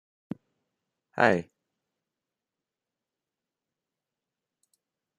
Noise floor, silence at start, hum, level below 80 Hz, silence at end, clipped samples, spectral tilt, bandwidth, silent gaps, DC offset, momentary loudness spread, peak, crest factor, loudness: -89 dBFS; 1.15 s; none; -78 dBFS; 3.75 s; under 0.1%; -6 dB/octave; 12 kHz; none; under 0.1%; 19 LU; -6 dBFS; 30 dB; -25 LUFS